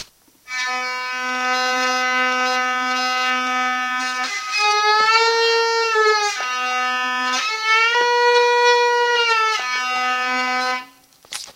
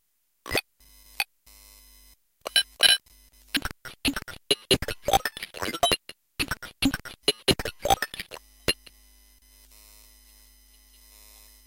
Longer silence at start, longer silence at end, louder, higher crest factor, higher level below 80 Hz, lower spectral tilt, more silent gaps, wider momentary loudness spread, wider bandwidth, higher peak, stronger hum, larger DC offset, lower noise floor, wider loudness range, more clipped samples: second, 0 s vs 0.45 s; second, 0.05 s vs 2.95 s; first, -17 LUFS vs -26 LUFS; second, 16 dB vs 24 dB; second, -72 dBFS vs -48 dBFS; second, 1 dB/octave vs -2 dB/octave; neither; second, 8 LU vs 12 LU; about the same, 16 kHz vs 17 kHz; about the same, -4 dBFS vs -6 dBFS; neither; neither; second, -46 dBFS vs -58 dBFS; second, 3 LU vs 8 LU; neither